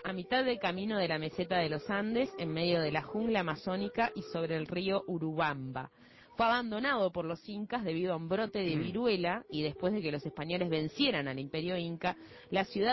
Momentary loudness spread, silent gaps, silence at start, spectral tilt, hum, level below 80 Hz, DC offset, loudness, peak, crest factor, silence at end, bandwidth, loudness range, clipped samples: 7 LU; none; 0 s; -7 dB/octave; none; -64 dBFS; under 0.1%; -34 LUFS; -18 dBFS; 16 dB; 0 s; 6 kHz; 1 LU; under 0.1%